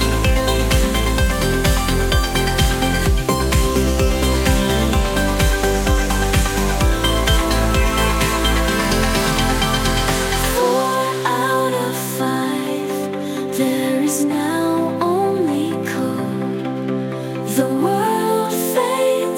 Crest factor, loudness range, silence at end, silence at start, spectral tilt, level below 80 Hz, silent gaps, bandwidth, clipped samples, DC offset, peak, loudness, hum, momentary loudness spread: 16 dB; 3 LU; 0 s; 0 s; -4.5 dB/octave; -22 dBFS; none; 18 kHz; under 0.1%; under 0.1%; -2 dBFS; -18 LUFS; none; 5 LU